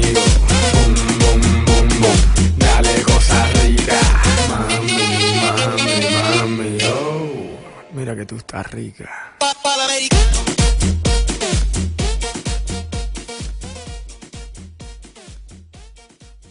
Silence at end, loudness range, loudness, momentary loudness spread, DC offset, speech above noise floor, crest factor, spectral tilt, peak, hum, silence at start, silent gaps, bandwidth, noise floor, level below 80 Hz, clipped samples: 0.65 s; 14 LU; -15 LUFS; 18 LU; under 0.1%; 26 dB; 16 dB; -4 dB/octave; 0 dBFS; none; 0 s; none; 11 kHz; -44 dBFS; -20 dBFS; under 0.1%